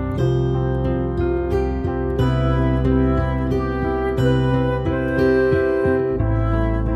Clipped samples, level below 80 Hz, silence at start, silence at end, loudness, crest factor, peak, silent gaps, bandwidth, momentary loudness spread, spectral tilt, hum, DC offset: under 0.1%; -26 dBFS; 0 s; 0 s; -20 LUFS; 14 dB; -6 dBFS; none; 7.8 kHz; 4 LU; -9 dB/octave; none; under 0.1%